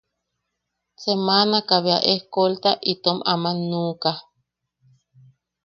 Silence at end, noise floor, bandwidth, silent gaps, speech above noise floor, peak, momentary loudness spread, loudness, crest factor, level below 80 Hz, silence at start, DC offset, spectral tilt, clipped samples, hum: 1.45 s; -79 dBFS; 6.8 kHz; none; 58 dB; -2 dBFS; 8 LU; -20 LUFS; 22 dB; -68 dBFS; 1 s; under 0.1%; -6 dB/octave; under 0.1%; none